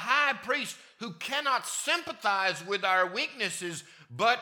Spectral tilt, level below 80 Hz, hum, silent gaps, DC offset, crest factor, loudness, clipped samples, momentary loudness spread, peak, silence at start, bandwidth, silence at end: -1.5 dB/octave; -82 dBFS; none; none; under 0.1%; 20 dB; -29 LUFS; under 0.1%; 12 LU; -10 dBFS; 0 s; 19 kHz; 0 s